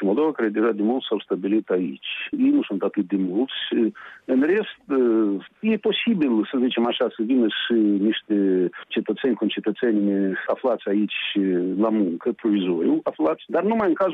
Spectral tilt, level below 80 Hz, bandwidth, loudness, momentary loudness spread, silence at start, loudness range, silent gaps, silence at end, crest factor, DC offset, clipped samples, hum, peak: -8.5 dB/octave; -70 dBFS; 4 kHz; -22 LUFS; 5 LU; 0 s; 2 LU; none; 0 s; 12 dB; under 0.1%; under 0.1%; none; -10 dBFS